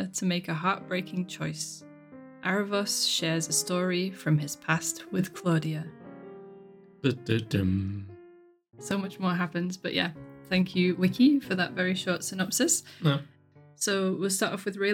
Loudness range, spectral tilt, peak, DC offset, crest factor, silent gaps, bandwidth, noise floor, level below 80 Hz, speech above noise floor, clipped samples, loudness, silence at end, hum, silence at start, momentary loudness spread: 5 LU; -4 dB/octave; -10 dBFS; under 0.1%; 20 dB; none; 18 kHz; -55 dBFS; -66 dBFS; 27 dB; under 0.1%; -28 LUFS; 0 s; none; 0 s; 11 LU